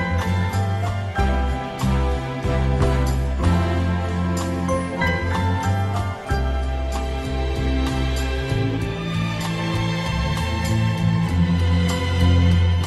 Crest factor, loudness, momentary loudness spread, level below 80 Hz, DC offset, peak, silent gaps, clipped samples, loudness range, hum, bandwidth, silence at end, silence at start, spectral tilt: 14 dB; -22 LUFS; 5 LU; -26 dBFS; under 0.1%; -6 dBFS; none; under 0.1%; 3 LU; none; 12.5 kHz; 0 s; 0 s; -6.5 dB/octave